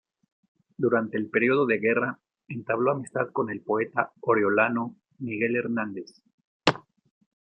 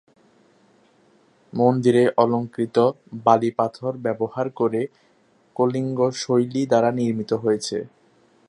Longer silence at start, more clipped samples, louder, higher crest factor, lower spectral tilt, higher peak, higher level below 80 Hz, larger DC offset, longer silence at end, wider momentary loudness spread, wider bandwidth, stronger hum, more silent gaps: second, 0.8 s vs 1.55 s; neither; second, -26 LUFS vs -22 LUFS; about the same, 26 dB vs 22 dB; about the same, -6 dB/octave vs -6.5 dB/octave; about the same, -2 dBFS vs -2 dBFS; about the same, -70 dBFS vs -68 dBFS; neither; about the same, 0.6 s vs 0.6 s; first, 15 LU vs 10 LU; second, 9.6 kHz vs 11 kHz; neither; first, 6.34-6.38 s, 6.47-6.60 s vs none